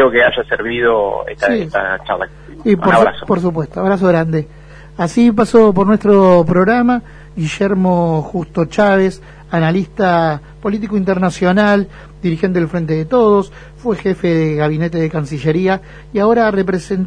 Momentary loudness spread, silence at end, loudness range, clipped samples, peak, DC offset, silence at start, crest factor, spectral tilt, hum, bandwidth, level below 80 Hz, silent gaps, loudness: 11 LU; 0 s; 4 LU; under 0.1%; 0 dBFS; under 0.1%; 0 s; 14 dB; -7.5 dB/octave; none; 10 kHz; -40 dBFS; none; -14 LUFS